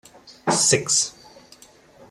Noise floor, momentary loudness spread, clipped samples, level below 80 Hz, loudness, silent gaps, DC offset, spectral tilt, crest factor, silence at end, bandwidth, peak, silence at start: -50 dBFS; 11 LU; under 0.1%; -62 dBFS; -19 LUFS; none; under 0.1%; -2 dB/octave; 20 dB; 1 s; 15.5 kHz; -6 dBFS; 0.3 s